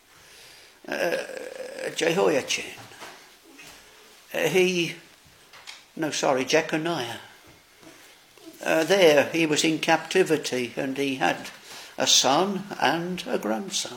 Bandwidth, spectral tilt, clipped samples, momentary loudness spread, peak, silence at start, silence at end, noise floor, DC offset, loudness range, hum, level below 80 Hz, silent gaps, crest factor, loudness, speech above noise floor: 17 kHz; -3 dB/octave; under 0.1%; 23 LU; -4 dBFS; 0.4 s; 0 s; -53 dBFS; under 0.1%; 6 LU; none; -70 dBFS; none; 22 dB; -24 LUFS; 29 dB